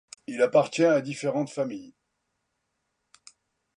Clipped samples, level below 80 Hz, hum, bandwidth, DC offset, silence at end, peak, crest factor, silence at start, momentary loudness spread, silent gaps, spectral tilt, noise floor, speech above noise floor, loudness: under 0.1%; -78 dBFS; none; 11 kHz; under 0.1%; 1.85 s; -8 dBFS; 20 dB; 0.3 s; 12 LU; none; -5.5 dB/octave; -79 dBFS; 54 dB; -25 LUFS